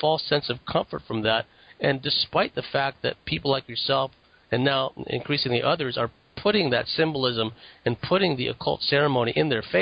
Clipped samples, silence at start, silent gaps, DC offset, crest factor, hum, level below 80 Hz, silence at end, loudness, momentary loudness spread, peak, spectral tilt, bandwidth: under 0.1%; 0 s; none; under 0.1%; 16 dB; none; -54 dBFS; 0 s; -25 LUFS; 7 LU; -8 dBFS; -9 dB/octave; 5.2 kHz